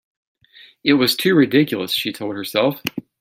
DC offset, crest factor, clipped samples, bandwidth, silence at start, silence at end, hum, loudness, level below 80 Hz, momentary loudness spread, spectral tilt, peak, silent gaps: under 0.1%; 18 dB; under 0.1%; 16.5 kHz; 0.85 s; 0.2 s; none; -18 LUFS; -62 dBFS; 11 LU; -5 dB/octave; -2 dBFS; none